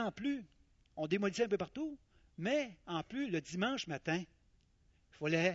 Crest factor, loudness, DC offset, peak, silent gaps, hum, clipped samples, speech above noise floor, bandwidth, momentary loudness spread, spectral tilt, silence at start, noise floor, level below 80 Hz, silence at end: 20 dB; -38 LUFS; under 0.1%; -18 dBFS; none; none; under 0.1%; 34 dB; 7.6 kHz; 10 LU; -4.5 dB/octave; 0 s; -71 dBFS; -70 dBFS; 0 s